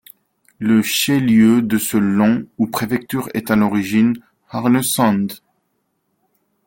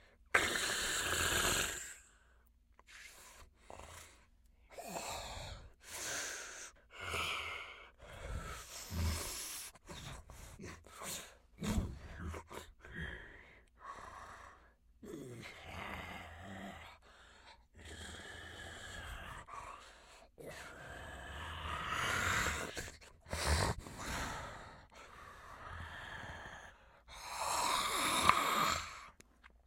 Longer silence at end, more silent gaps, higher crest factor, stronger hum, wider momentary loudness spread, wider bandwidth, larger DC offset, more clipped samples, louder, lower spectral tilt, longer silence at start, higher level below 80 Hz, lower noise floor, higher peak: first, 1.3 s vs 0.1 s; neither; second, 16 dB vs 34 dB; neither; second, 10 LU vs 22 LU; about the same, 17 kHz vs 16.5 kHz; neither; neither; first, -17 LUFS vs -39 LUFS; first, -5 dB/octave vs -2.5 dB/octave; first, 0.6 s vs 0 s; about the same, -54 dBFS vs -54 dBFS; about the same, -69 dBFS vs -68 dBFS; first, -2 dBFS vs -8 dBFS